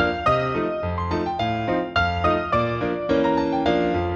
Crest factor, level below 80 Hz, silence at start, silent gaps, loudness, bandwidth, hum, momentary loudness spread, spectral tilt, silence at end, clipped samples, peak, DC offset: 14 dB; -40 dBFS; 0 s; none; -22 LUFS; 7.8 kHz; none; 4 LU; -7 dB/octave; 0 s; under 0.1%; -6 dBFS; under 0.1%